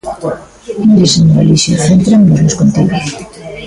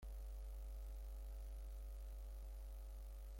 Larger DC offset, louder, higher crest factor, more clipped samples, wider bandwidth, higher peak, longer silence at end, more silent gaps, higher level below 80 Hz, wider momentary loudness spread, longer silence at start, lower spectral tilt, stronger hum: neither; first, -9 LUFS vs -55 LUFS; about the same, 10 dB vs 8 dB; neither; second, 11.5 kHz vs 16.5 kHz; first, 0 dBFS vs -42 dBFS; about the same, 0 s vs 0 s; neither; first, -36 dBFS vs -50 dBFS; first, 17 LU vs 2 LU; about the same, 0.05 s vs 0 s; about the same, -5.5 dB/octave vs -5.5 dB/octave; neither